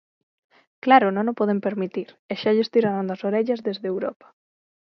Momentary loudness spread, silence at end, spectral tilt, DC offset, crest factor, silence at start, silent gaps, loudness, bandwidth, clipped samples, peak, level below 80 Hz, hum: 13 LU; 0.85 s; -8 dB/octave; under 0.1%; 20 dB; 0.85 s; 2.19-2.29 s; -23 LUFS; 6.2 kHz; under 0.1%; -4 dBFS; -74 dBFS; none